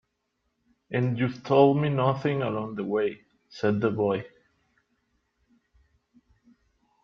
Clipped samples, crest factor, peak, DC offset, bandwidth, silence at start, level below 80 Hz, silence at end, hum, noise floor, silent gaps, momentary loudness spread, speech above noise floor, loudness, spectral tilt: under 0.1%; 22 dB; -6 dBFS; under 0.1%; 6.6 kHz; 0.9 s; -66 dBFS; 2.75 s; none; -77 dBFS; none; 12 LU; 53 dB; -26 LUFS; -8.5 dB/octave